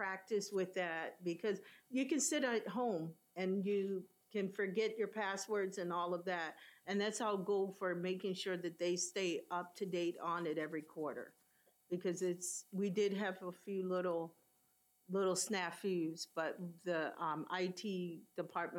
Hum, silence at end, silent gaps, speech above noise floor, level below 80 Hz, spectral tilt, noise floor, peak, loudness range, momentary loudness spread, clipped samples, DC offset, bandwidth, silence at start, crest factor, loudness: none; 0 s; none; 36 dB; under -90 dBFS; -4 dB/octave; -76 dBFS; -24 dBFS; 2 LU; 7 LU; under 0.1%; under 0.1%; 17 kHz; 0 s; 16 dB; -40 LUFS